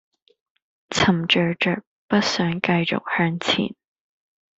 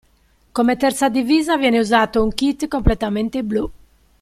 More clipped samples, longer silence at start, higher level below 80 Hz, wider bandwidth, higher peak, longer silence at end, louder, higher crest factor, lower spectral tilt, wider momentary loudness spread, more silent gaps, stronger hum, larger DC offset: neither; first, 0.9 s vs 0.55 s; second, -58 dBFS vs -32 dBFS; second, 8 kHz vs 15 kHz; about the same, -2 dBFS vs -2 dBFS; first, 0.9 s vs 0.45 s; second, -21 LUFS vs -18 LUFS; about the same, 20 dB vs 16 dB; about the same, -5 dB/octave vs -5 dB/octave; about the same, 5 LU vs 7 LU; first, 1.87-2.08 s vs none; neither; neither